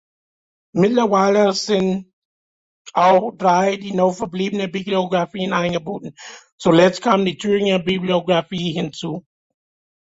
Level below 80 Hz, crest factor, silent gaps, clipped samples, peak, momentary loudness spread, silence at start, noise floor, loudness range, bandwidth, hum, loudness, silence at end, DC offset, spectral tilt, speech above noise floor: -58 dBFS; 18 dB; 2.13-2.85 s, 6.52-6.58 s; under 0.1%; -2 dBFS; 13 LU; 0.75 s; under -90 dBFS; 3 LU; 8 kHz; none; -18 LUFS; 0.9 s; under 0.1%; -5.5 dB/octave; over 72 dB